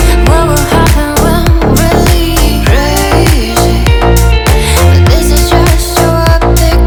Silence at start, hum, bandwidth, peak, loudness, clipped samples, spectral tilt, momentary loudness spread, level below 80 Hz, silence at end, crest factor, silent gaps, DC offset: 0 s; none; over 20 kHz; 0 dBFS; -8 LUFS; 4%; -5 dB/octave; 2 LU; -10 dBFS; 0 s; 6 dB; none; under 0.1%